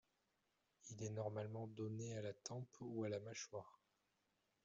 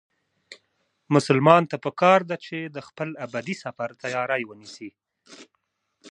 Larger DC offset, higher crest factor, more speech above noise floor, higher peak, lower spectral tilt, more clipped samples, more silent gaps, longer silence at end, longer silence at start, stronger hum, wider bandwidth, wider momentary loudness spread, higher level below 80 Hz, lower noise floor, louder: neither; second, 18 dB vs 24 dB; second, 37 dB vs 52 dB; second, -34 dBFS vs 0 dBFS; about the same, -6.5 dB/octave vs -6 dB/octave; neither; neither; first, 0.9 s vs 0.7 s; first, 0.85 s vs 0.5 s; neither; second, 7.6 kHz vs 11 kHz; second, 9 LU vs 19 LU; second, -86 dBFS vs -74 dBFS; first, -86 dBFS vs -75 dBFS; second, -50 LUFS vs -23 LUFS